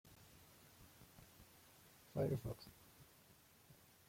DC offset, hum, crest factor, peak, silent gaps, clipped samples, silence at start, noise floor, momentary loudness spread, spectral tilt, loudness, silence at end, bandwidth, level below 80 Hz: under 0.1%; none; 22 dB; -30 dBFS; none; under 0.1%; 0.05 s; -68 dBFS; 23 LU; -7 dB/octave; -46 LUFS; 0.35 s; 16.5 kHz; -70 dBFS